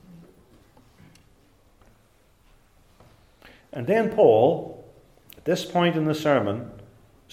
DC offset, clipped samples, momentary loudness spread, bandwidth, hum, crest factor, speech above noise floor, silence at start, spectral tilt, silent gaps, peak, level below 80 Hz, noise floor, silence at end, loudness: under 0.1%; under 0.1%; 22 LU; 16 kHz; none; 20 dB; 39 dB; 3.75 s; -6.5 dB/octave; none; -6 dBFS; -60 dBFS; -60 dBFS; 0.5 s; -22 LUFS